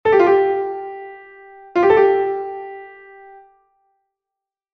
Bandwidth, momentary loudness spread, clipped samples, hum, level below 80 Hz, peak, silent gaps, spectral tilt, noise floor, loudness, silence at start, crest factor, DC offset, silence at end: 6.2 kHz; 23 LU; under 0.1%; none; -58 dBFS; -2 dBFS; none; -7 dB/octave; -86 dBFS; -17 LUFS; 0.05 s; 18 dB; under 0.1%; 1.85 s